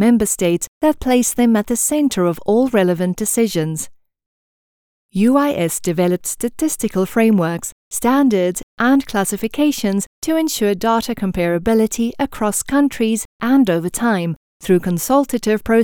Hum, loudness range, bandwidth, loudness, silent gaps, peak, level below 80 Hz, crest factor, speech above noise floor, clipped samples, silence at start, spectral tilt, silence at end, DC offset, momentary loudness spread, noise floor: none; 3 LU; over 20 kHz; -17 LUFS; 0.68-0.81 s, 4.26-5.09 s, 7.72-7.91 s, 8.63-8.77 s, 10.06-10.22 s, 13.25-13.40 s, 14.36-14.60 s; 0 dBFS; -44 dBFS; 16 dB; over 74 dB; under 0.1%; 0 s; -5 dB/octave; 0 s; under 0.1%; 6 LU; under -90 dBFS